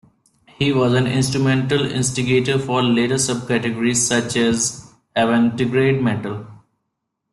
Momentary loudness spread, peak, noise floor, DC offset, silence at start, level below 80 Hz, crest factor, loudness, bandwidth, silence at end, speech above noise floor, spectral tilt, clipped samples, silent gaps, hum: 5 LU; -6 dBFS; -76 dBFS; under 0.1%; 0.6 s; -52 dBFS; 14 dB; -18 LUFS; 12.5 kHz; 0.75 s; 58 dB; -4.5 dB/octave; under 0.1%; none; none